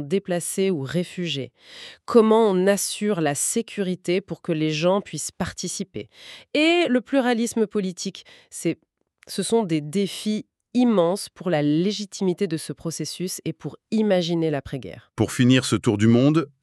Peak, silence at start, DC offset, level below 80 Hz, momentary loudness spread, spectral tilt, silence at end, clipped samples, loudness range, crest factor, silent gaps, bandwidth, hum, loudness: -4 dBFS; 0 s; under 0.1%; -60 dBFS; 14 LU; -5 dB/octave; 0.15 s; under 0.1%; 4 LU; 20 dB; none; 13.5 kHz; none; -23 LUFS